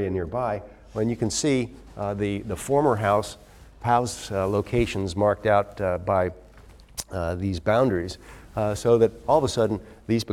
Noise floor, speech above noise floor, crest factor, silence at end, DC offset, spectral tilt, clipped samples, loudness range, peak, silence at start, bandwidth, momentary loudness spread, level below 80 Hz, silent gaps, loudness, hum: -48 dBFS; 24 dB; 18 dB; 0 s; under 0.1%; -5.5 dB/octave; under 0.1%; 2 LU; -6 dBFS; 0 s; 17 kHz; 13 LU; -46 dBFS; none; -25 LUFS; none